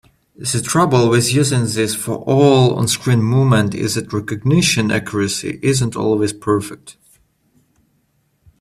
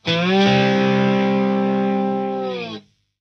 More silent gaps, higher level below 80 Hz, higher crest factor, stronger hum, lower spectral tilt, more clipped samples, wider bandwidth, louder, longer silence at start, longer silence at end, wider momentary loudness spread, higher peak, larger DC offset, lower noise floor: neither; first, -50 dBFS vs -56 dBFS; about the same, 16 dB vs 14 dB; neither; second, -5 dB/octave vs -6.5 dB/octave; neither; first, 15 kHz vs 6.6 kHz; about the same, -16 LUFS vs -18 LUFS; first, 0.4 s vs 0.05 s; first, 1.7 s vs 0.4 s; second, 8 LU vs 12 LU; first, 0 dBFS vs -4 dBFS; neither; first, -63 dBFS vs -38 dBFS